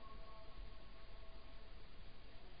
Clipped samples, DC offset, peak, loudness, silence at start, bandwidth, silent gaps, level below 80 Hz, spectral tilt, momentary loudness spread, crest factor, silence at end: under 0.1%; 0.3%; -40 dBFS; -61 LUFS; 0 s; 5 kHz; none; -58 dBFS; -3.5 dB/octave; 3 LU; 14 dB; 0 s